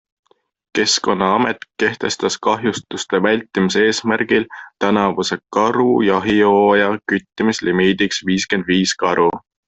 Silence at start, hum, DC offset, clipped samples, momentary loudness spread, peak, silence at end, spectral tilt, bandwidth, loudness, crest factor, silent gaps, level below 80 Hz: 0.75 s; none; under 0.1%; under 0.1%; 6 LU; -2 dBFS; 0.3 s; -4 dB/octave; 8.4 kHz; -17 LUFS; 14 dB; none; -54 dBFS